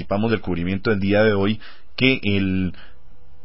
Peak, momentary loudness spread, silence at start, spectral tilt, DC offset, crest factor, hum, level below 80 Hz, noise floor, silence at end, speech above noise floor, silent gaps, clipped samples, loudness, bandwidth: 0 dBFS; 9 LU; 0 s; -11 dB/octave; 3%; 20 dB; none; -42 dBFS; -47 dBFS; 0.35 s; 27 dB; none; under 0.1%; -21 LUFS; 5.8 kHz